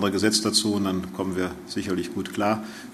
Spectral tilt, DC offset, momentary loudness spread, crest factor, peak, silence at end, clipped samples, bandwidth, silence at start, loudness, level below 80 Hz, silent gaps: -3.5 dB/octave; under 0.1%; 9 LU; 20 dB; -6 dBFS; 0 s; under 0.1%; 13.5 kHz; 0 s; -25 LUFS; -58 dBFS; none